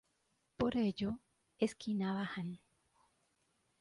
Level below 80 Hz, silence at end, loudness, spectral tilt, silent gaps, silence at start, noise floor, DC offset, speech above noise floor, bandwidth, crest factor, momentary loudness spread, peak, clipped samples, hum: -66 dBFS; 1.25 s; -39 LUFS; -6.5 dB/octave; none; 0.6 s; -80 dBFS; under 0.1%; 42 dB; 11.5 kHz; 18 dB; 12 LU; -22 dBFS; under 0.1%; none